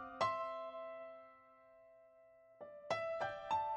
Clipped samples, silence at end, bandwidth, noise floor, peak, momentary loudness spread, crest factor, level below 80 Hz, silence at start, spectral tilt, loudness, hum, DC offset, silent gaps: under 0.1%; 0 s; 9.6 kHz; -65 dBFS; -24 dBFS; 25 LU; 20 dB; -78 dBFS; 0 s; -4 dB/octave; -42 LUFS; none; under 0.1%; none